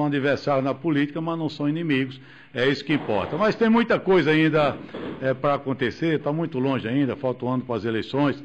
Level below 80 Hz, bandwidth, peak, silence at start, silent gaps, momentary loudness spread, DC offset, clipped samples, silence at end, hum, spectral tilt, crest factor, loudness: -58 dBFS; 8.2 kHz; -12 dBFS; 0 s; none; 8 LU; under 0.1%; under 0.1%; 0 s; none; -7.5 dB/octave; 12 dB; -23 LUFS